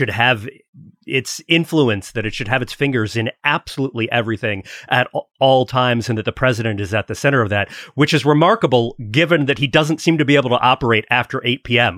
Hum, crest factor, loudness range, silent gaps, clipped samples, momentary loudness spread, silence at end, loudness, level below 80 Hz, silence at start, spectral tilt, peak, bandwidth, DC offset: none; 16 dB; 4 LU; 0.68-0.73 s; under 0.1%; 8 LU; 0 s; -17 LUFS; -48 dBFS; 0 s; -5.5 dB/octave; 0 dBFS; 15.5 kHz; under 0.1%